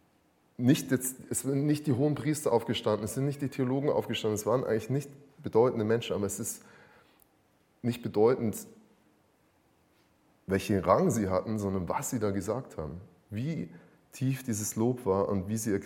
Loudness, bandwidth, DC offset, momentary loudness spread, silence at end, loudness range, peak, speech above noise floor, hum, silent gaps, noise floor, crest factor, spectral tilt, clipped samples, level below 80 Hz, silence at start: -30 LUFS; 17 kHz; under 0.1%; 13 LU; 0 s; 4 LU; -10 dBFS; 38 dB; none; none; -68 dBFS; 22 dB; -5.5 dB/octave; under 0.1%; -62 dBFS; 0.6 s